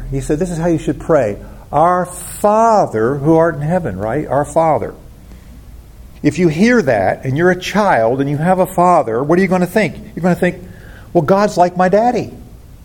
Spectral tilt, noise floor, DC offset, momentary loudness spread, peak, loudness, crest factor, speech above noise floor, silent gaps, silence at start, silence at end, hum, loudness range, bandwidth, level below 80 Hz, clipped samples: -6.5 dB/octave; -36 dBFS; under 0.1%; 8 LU; 0 dBFS; -14 LUFS; 14 dB; 23 dB; none; 0 s; 0.1 s; none; 3 LU; 17.5 kHz; -38 dBFS; under 0.1%